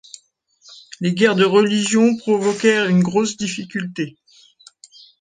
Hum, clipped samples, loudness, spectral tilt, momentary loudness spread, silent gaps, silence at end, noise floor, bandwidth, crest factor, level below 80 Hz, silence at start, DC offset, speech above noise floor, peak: none; under 0.1%; -18 LUFS; -5 dB/octave; 12 LU; none; 1.1 s; -56 dBFS; 9.8 kHz; 18 dB; -62 dBFS; 0.7 s; under 0.1%; 40 dB; -2 dBFS